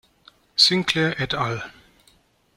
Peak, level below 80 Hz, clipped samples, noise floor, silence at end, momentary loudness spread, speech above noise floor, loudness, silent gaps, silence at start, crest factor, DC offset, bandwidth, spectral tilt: -2 dBFS; -56 dBFS; under 0.1%; -60 dBFS; 0.85 s; 14 LU; 36 dB; -20 LUFS; none; 0.55 s; 22 dB; under 0.1%; 16.5 kHz; -3.5 dB/octave